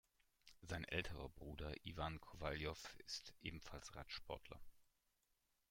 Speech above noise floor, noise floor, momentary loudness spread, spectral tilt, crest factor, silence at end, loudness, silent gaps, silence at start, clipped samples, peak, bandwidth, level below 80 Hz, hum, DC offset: 35 dB; -85 dBFS; 9 LU; -4.5 dB/octave; 24 dB; 0.85 s; -51 LUFS; none; 0.45 s; under 0.1%; -28 dBFS; 16.5 kHz; -62 dBFS; none; under 0.1%